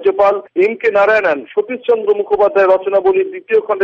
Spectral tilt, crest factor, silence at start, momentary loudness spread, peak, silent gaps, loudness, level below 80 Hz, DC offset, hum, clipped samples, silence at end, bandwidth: -6 dB/octave; 10 dB; 0 s; 6 LU; -2 dBFS; none; -14 LUFS; -56 dBFS; under 0.1%; none; under 0.1%; 0 s; 6.6 kHz